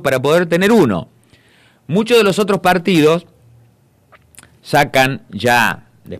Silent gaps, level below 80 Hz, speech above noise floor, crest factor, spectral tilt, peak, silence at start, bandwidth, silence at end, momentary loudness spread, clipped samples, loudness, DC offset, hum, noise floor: none; -50 dBFS; 39 dB; 16 dB; -5 dB/octave; 0 dBFS; 0 s; 15 kHz; 0 s; 8 LU; under 0.1%; -14 LUFS; under 0.1%; none; -52 dBFS